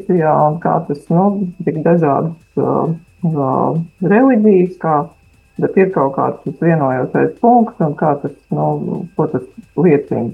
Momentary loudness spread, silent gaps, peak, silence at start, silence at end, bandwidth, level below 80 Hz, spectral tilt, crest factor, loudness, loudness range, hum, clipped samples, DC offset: 9 LU; none; 0 dBFS; 0 s; 0 s; 5 kHz; -54 dBFS; -11 dB/octave; 14 dB; -15 LUFS; 2 LU; none; under 0.1%; under 0.1%